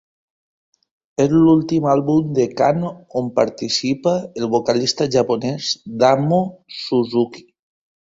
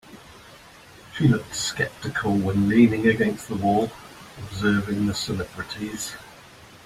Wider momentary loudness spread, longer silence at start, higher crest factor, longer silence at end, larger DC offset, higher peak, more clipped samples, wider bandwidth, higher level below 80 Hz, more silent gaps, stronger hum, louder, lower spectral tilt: second, 9 LU vs 17 LU; first, 1.2 s vs 0.1 s; about the same, 18 dB vs 20 dB; first, 0.7 s vs 0.1 s; neither; first, 0 dBFS vs -6 dBFS; neither; second, 7.8 kHz vs 15.5 kHz; about the same, -56 dBFS vs -52 dBFS; neither; neither; first, -18 LUFS vs -23 LUFS; about the same, -5.5 dB/octave vs -5.5 dB/octave